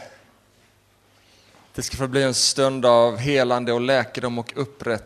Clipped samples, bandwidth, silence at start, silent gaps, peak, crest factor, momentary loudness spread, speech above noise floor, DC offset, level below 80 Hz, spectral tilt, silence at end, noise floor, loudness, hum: under 0.1%; 13.5 kHz; 0 s; none; -4 dBFS; 20 dB; 13 LU; 38 dB; under 0.1%; -52 dBFS; -3.5 dB/octave; 0 s; -59 dBFS; -21 LUFS; 50 Hz at -65 dBFS